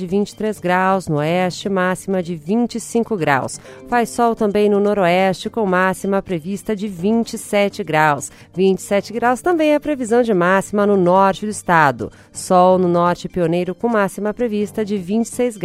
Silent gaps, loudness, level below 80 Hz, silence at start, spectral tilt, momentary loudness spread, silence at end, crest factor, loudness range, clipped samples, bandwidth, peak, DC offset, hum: none; -17 LUFS; -50 dBFS; 0 s; -5.5 dB/octave; 8 LU; 0 s; 16 dB; 3 LU; under 0.1%; 15.5 kHz; 0 dBFS; under 0.1%; none